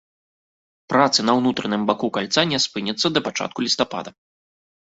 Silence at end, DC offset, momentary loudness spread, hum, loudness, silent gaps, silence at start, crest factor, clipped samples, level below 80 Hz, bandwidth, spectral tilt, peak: 0.85 s; under 0.1%; 8 LU; none; -20 LUFS; none; 0.9 s; 20 dB; under 0.1%; -62 dBFS; 8 kHz; -3.5 dB/octave; -2 dBFS